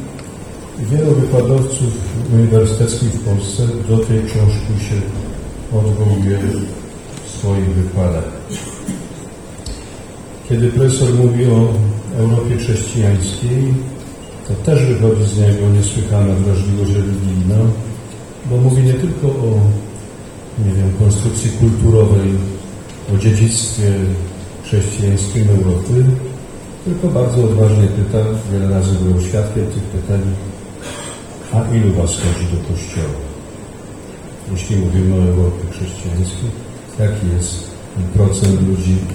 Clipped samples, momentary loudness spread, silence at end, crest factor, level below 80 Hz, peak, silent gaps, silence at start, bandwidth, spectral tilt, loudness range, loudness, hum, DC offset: under 0.1%; 17 LU; 0 s; 14 dB; -34 dBFS; 0 dBFS; none; 0 s; 12 kHz; -6.5 dB/octave; 5 LU; -15 LUFS; none; under 0.1%